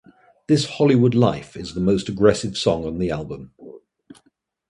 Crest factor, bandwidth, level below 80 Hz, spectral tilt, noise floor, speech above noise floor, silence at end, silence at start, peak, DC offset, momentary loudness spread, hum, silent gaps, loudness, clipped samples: 20 dB; 11.5 kHz; -46 dBFS; -6.5 dB/octave; -65 dBFS; 45 dB; 0.9 s; 0.5 s; -2 dBFS; under 0.1%; 15 LU; none; none; -20 LUFS; under 0.1%